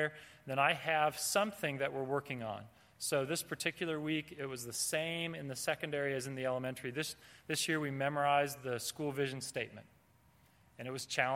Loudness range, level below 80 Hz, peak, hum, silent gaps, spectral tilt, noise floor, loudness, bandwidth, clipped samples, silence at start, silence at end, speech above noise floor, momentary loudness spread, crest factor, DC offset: 3 LU; -76 dBFS; -14 dBFS; none; none; -3.5 dB/octave; -67 dBFS; -36 LUFS; 16.5 kHz; under 0.1%; 0 s; 0 s; 31 dB; 10 LU; 22 dB; under 0.1%